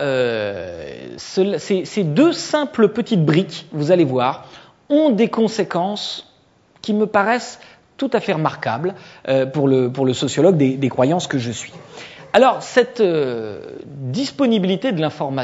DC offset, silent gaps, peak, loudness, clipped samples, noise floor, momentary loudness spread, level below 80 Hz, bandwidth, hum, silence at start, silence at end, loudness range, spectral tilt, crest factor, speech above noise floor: under 0.1%; none; 0 dBFS; -18 LUFS; under 0.1%; -54 dBFS; 16 LU; -62 dBFS; 8 kHz; none; 0 s; 0 s; 3 LU; -6 dB/octave; 18 dB; 37 dB